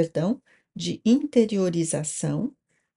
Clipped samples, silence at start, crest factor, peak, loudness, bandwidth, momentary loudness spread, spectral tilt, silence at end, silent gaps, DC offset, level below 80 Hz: under 0.1%; 0 s; 18 dB; -8 dBFS; -25 LUFS; 11.5 kHz; 12 LU; -5.5 dB/octave; 0.45 s; none; under 0.1%; -64 dBFS